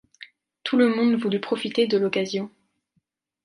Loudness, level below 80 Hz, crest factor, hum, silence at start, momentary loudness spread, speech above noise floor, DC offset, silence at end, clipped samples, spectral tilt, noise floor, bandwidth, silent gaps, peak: -23 LUFS; -72 dBFS; 16 dB; none; 0.2 s; 11 LU; 51 dB; under 0.1%; 0.95 s; under 0.1%; -5.5 dB/octave; -73 dBFS; 11 kHz; none; -8 dBFS